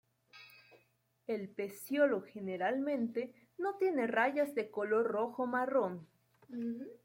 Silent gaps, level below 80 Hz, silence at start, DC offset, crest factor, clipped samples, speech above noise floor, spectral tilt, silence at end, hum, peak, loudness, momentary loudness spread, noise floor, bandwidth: none; -86 dBFS; 0.35 s; under 0.1%; 18 dB; under 0.1%; 40 dB; -6 dB/octave; 0.1 s; none; -18 dBFS; -35 LUFS; 12 LU; -75 dBFS; 16.5 kHz